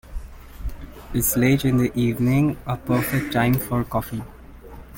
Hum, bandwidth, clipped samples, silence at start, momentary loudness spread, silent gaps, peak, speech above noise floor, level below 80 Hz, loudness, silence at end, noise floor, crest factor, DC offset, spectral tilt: none; 17 kHz; under 0.1%; 0.05 s; 18 LU; none; -6 dBFS; 20 dB; -38 dBFS; -21 LUFS; 0 s; -41 dBFS; 16 dB; under 0.1%; -6 dB/octave